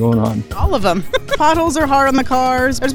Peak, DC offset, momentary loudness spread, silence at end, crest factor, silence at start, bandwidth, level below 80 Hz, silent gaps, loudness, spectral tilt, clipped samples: -2 dBFS; under 0.1%; 6 LU; 0 s; 12 dB; 0 s; 19.5 kHz; -30 dBFS; none; -15 LUFS; -5.5 dB/octave; under 0.1%